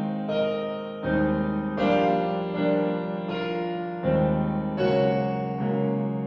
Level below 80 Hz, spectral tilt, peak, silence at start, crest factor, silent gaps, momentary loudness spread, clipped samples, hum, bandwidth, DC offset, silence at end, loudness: -48 dBFS; -9 dB/octave; -10 dBFS; 0 s; 16 dB; none; 7 LU; under 0.1%; none; 6.2 kHz; under 0.1%; 0 s; -26 LUFS